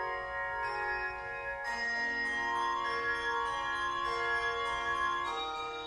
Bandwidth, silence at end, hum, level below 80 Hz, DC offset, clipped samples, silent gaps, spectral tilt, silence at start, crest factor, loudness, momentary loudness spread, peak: 12 kHz; 0 s; none; -58 dBFS; under 0.1%; under 0.1%; none; -2.5 dB/octave; 0 s; 14 dB; -33 LUFS; 4 LU; -20 dBFS